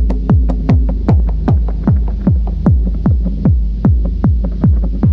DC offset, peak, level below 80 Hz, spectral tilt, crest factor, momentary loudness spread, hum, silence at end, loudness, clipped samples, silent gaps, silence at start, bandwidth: under 0.1%; 0 dBFS; -14 dBFS; -11.5 dB/octave; 12 dB; 2 LU; none; 0 s; -14 LUFS; under 0.1%; none; 0 s; 4.4 kHz